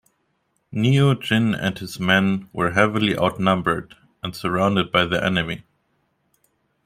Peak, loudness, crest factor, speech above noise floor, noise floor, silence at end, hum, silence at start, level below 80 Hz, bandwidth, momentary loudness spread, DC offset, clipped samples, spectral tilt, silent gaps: -2 dBFS; -20 LUFS; 20 dB; 49 dB; -70 dBFS; 1.25 s; none; 0.7 s; -52 dBFS; 15.5 kHz; 10 LU; under 0.1%; under 0.1%; -6 dB/octave; none